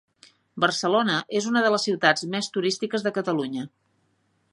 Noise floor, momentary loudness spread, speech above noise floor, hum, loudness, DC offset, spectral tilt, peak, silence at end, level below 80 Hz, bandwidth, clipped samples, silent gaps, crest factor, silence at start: -69 dBFS; 9 LU; 45 dB; none; -24 LUFS; under 0.1%; -4 dB/octave; -2 dBFS; 0.85 s; -76 dBFS; 11.5 kHz; under 0.1%; none; 22 dB; 0.55 s